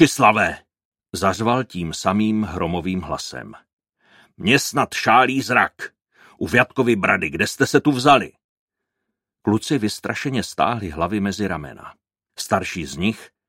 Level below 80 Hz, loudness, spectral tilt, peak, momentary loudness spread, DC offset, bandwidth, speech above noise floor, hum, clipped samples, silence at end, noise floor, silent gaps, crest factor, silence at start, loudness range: -50 dBFS; -20 LUFS; -4.5 dB/octave; 0 dBFS; 15 LU; under 0.1%; 16.5 kHz; 60 dB; none; under 0.1%; 0.2 s; -80 dBFS; 0.85-0.92 s, 3.73-3.77 s, 8.44-8.67 s; 20 dB; 0 s; 6 LU